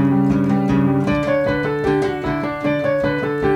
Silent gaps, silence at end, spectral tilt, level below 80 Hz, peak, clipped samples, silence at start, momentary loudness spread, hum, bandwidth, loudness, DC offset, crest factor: none; 0 s; -8 dB/octave; -40 dBFS; -6 dBFS; under 0.1%; 0 s; 4 LU; none; 10 kHz; -18 LUFS; under 0.1%; 12 dB